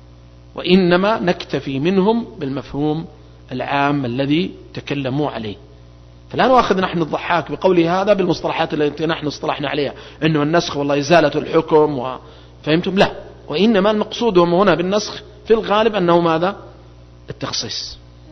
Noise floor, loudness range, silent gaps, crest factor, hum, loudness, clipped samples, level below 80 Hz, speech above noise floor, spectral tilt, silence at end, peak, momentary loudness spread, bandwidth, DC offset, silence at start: -42 dBFS; 4 LU; none; 16 dB; none; -17 LUFS; under 0.1%; -44 dBFS; 25 dB; -6 dB/octave; 0 s; 0 dBFS; 13 LU; 6.4 kHz; under 0.1%; 0.55 s